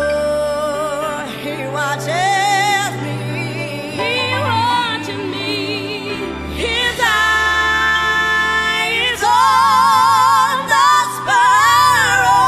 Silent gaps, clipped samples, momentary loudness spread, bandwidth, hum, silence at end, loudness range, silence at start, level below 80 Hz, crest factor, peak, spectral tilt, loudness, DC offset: none; under 0.1%; 11 LU; 15 kHz; none; 0 s; 7 LU; 0 s; -40 dBFS; 14 dB; -2 dBFS; -2.5 dB/octave; -15 LUFS; under 0.1%